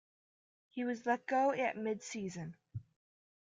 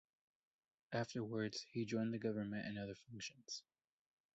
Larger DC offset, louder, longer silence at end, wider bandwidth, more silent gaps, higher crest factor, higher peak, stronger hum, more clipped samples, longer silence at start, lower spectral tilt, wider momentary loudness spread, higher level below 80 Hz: neither; first, -37 LUFS vs -45 LUFS; second, 0.6 s vs 0.75 s; first, 9.4 kHz vs 8 kHz; neither; about the same, 18 dB vs 18 dB; first, -20 dBFS vs -28 dBFS; neither; neither; second, 0.75 s vs 0.9 s; about the same, -5.5 dB/octave vs -5 dB/octave; first, 18 LU vs 9 LU; about the same, -78 dBFS vs -78 dBFS